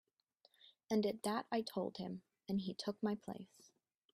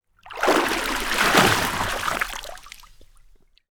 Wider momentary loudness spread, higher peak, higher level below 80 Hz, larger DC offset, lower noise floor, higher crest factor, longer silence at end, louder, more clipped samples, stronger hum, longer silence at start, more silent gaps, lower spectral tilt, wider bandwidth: second, 13 LU vs 20 LU; second, -24 dBFS vs -2 dBFS; second, -82 dBFS vs -42 dBFS; neither; first, -76 dBFS vs -53 dBFS; about the same, 18 dB vs 22 dB; second, 0.7 s vs 0.85 s; second, -42 LUFS vs -21 LUFS; neither; neither; first, 0.9 s vs 0.25 s; neither; first, -5.5 dB/octave vs -2.5 dB/octave; second, 14.5 kHz vs over 20 kHz